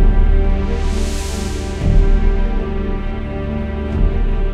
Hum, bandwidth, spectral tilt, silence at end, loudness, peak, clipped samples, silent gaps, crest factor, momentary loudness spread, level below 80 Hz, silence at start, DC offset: none; 10.5 kHz; -6.5 dB/octave; 0 s; -20 LUFS; -2 dBFS; under 0.1%; none; 12 dB; 7 LU; -16 dBFS; 0 s; under 0.1%